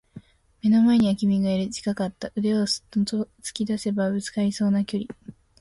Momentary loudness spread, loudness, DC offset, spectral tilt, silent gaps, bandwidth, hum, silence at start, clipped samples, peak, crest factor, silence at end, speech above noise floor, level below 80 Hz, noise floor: 10 LU; -24 LUFS; under 0.1%; -6 dB/octave; none; 11.5 kHz; none; 0.15 s; under 0.1%; -10 dBFS; 14 dB; 0.3 s; 24 dB; -58 dBFS; -47 dBFS